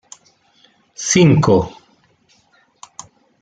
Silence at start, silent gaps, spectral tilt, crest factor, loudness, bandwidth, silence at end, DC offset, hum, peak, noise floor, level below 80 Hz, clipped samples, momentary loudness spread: 1 s; none; -5 dB/octave; 18 dB; -14 LUFS; 9.4 kHz; 1.75 s; under 0.1%; none; -2 dBFS; -57 dBFS; -48 dBFS; under 0.1%; 26 LU